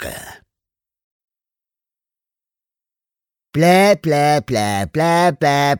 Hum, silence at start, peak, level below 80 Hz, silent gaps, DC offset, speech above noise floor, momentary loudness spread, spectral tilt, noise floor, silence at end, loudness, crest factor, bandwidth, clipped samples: none; 0 s; -2 dBFS; -52 dBFS; 1.04-1.28 s; under 0.1%; 74 dB; 12 LU; -5.5 dB/octave; -89 dBFS; 0 s; -15 LUFS; 16 dB; 19 kHz; under 0.1%